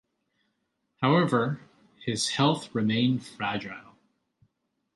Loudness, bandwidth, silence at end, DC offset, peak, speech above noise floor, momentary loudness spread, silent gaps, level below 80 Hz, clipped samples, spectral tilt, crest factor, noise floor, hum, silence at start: -27 LUFS; 11.5 kHz; 1.15 s; under 0.1%; -8 dBFS; 51 dB; 15 LU; none; -68 dBFS; under 0.1%; -5 dB/octave; 20 dB; -78 dBFS; none; 1 s